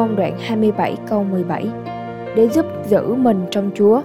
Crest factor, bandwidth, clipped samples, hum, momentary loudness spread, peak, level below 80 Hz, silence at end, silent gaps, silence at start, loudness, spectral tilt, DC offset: 14 dB; 14.5 kHz; under 0.1%; none; 9 LU; -2 dBFS; -58 dBFS; 0 s; none; 0 s; -18 LUFS; -7.5 dB/octave; 0.1%